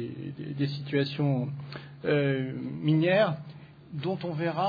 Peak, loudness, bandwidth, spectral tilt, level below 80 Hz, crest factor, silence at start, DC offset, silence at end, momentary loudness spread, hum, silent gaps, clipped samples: -12 dBFS; -29 LUFS; 5 kHz; -9 dB/octave; -68 dBFS; 16 dB; 0 s; under 0.1%; 0 s; 15 LU; none; none; under 0.1%